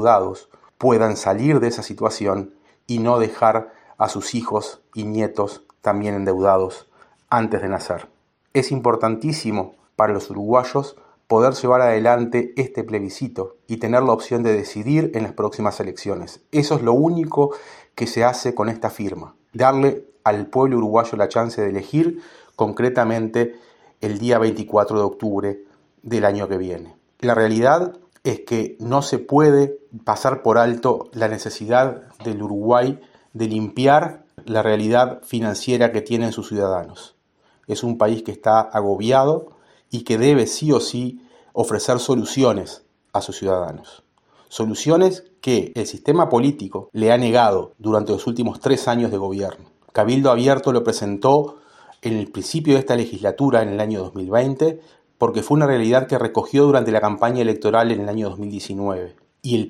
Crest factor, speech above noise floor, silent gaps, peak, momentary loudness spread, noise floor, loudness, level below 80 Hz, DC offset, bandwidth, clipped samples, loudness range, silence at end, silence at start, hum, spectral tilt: 18 dB; 42 dB; none; -2 dBFS; 12 LU; -61 dBFS; -19 LUFS; -60 dBFS; under 0.1%; 14 kHz; under 0.1%; 3 LU; 0 s; 0 s; none; -6 dB/octave